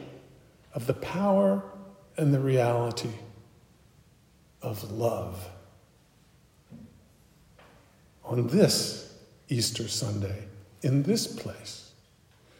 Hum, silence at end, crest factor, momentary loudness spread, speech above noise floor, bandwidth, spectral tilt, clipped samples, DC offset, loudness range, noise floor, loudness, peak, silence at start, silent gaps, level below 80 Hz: none; 0.75 s; 24 dB; 22 LU; 34 dB; 16 kHz; -5.5 dB/octave; under 0.1%; under 0.1%; 10 LU; -61 dBFS; -28 LUFS; -6 dBFS; 0 s; none; -66 dBFS